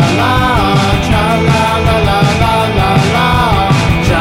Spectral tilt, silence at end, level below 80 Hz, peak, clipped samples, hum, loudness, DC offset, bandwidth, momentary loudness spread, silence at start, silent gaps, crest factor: -5.5 dB/octave; 0 s; -22 dBFS; 0 dBFS; under 0.1%; none; -10 LUFS; 0.5%; 16.5 kHz; 1 LU; 0 s; none; 10 dB